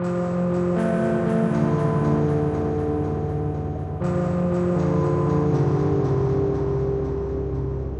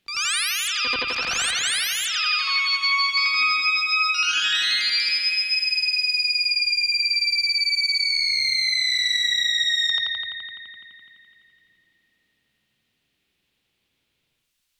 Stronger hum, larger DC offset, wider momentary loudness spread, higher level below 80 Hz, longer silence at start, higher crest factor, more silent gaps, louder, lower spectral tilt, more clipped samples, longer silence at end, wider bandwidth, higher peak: neither; neither; about the same, 6 LU vs 4 LU; first, -38 dBFS vs -64 dBFS; about the same, 0 s vs 0.1 s; about the same, 12 dB vs 14 dB; neither; second, -23 LUFS vs -19 LUFS; first, -9.5 dB/octave vs 3 dB/octave; neither; second, 0 s vs 3.8 s; second, 9.6 kHz vs over 20 kHz; about the same, -10 dBFS vs -10 dBFS